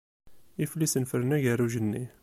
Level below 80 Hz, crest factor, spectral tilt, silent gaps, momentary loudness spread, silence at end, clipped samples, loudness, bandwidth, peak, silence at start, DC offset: -64 dBFS; 16 dB; -5.5 dB/octave; none; 8 LU; 0.15 s; under 0.1%; -28 LUFS; 15 kHz; -14 dBFS; 0.25 s; under 0.1%